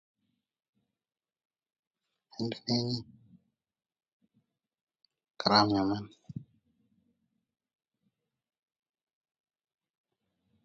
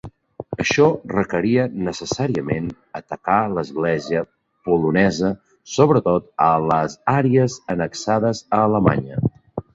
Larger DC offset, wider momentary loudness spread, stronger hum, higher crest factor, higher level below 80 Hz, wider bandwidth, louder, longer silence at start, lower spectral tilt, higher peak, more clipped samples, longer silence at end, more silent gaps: neither; first, 22 LU vs 12 LU; neither; first, 30 dB vs 18 dB; second, -68 dBFS vs -48 dBFS; about the same, 7.8 kHz vs 8 kHz; second, -30 LUFS vs -20 LUFS; first, 2.4 s vs 0.05 s; about the same, -5.5 dB/octave vs -6.5 dB/octave; second, -8 dBFS vs -2 dBFS; neither; first, 4.2 s vs 0.15 s; first, 4.08-4.20 s vs none